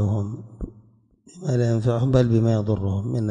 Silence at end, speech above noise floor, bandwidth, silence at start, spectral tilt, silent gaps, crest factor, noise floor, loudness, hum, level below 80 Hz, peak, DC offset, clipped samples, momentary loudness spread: 0 s; 34 dB; 8.8 kHz; 0 s; -8.5 dB/octave; none; 16 dB; -55 dBFS; -22 LUFS; none; -44 dBFS; -6 dBFS; under 0.1%; under 0.1%; 18 LU